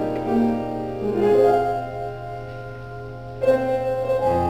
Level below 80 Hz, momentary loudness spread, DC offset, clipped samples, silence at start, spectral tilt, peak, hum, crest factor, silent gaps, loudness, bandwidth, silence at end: -44 dBFS; 18 LU; under 0.1%; under 0.1%; 0 s; -8 dB/octave; -6 dBFS; none; 16 dB; none; -22 LUFS; 17 kHz; 0 s